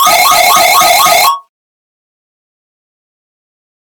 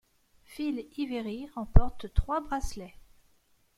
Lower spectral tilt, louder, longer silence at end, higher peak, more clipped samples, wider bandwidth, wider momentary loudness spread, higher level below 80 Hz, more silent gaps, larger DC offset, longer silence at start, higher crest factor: second, 0.5 dB/octave vs -7 dB/octave; first, -5 LUFS vs -32 LUFS; first, 2.45 s vs 0.9 s; first, 0 dBFS vs -4 dBFS; first, 0.4% vs under 0.1%; first, over 20 kHz vs 12.5 kHz; second, 5 LU vs 15 LU; second, -50 dBFS vs -34 dBFS; neither; neither; second, 0 s vs 0.5 s; second, 10 dB vs 26 dB